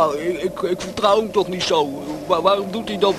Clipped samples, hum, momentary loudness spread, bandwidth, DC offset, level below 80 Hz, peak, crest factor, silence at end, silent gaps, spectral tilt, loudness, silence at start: under 0.1%; none; 7 LU; 13.5 kHz; under 0.1%; -50 dBFS; 0 dBFS; 18 dB; 0 s; none; -4.5 dB/octave; -20 LUFS; 0 s